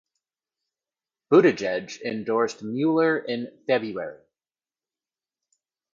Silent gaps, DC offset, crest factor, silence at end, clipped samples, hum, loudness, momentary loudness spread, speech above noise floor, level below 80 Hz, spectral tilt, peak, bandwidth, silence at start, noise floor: none; under 0.1%; 22 dB; 1.75 s; under 0.1%; none; -24 LUFS; 14 LU; over 67 dB; -72 dBFS; -6 dB/octave; -6 dBFS; 7.6 kHz; 1.3 s; under -90 dBFS